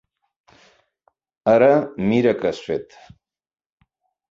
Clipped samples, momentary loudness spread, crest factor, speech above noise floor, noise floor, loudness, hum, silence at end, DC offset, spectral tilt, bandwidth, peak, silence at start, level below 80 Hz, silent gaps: under 0.1%; 13 LU; 18 dB; 49 dB; -67 dBFS; -19 LUFS; none; 1.5 s; under 0.1%; -7.5 dB/octave; 7.6 kHz; -4 dBFS; 1.45 s; -58 dBFS; none